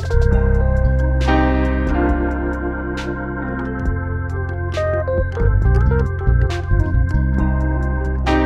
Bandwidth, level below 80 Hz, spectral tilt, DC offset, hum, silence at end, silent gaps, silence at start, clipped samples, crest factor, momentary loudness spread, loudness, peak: 7.4 kHz; -20 dBFS; -8 dB/octave; under 0.1%; none; 0 s; none; 0 s; under 0.1%; 14 dB; 8 LU; -19 LUFS; -2 dBFS